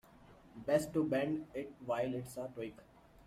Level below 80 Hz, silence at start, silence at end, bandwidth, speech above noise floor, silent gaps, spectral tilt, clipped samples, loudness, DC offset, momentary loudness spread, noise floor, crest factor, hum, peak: -68 dBFS; 0.25 s; 0.25 s; 16 kHz; 23 dB; none; -6 dB/octave; under 0.1%; -38 LUFS; under 0.1%; 13 LU; -61 dBFS; 20 dB; none; -20 dBFS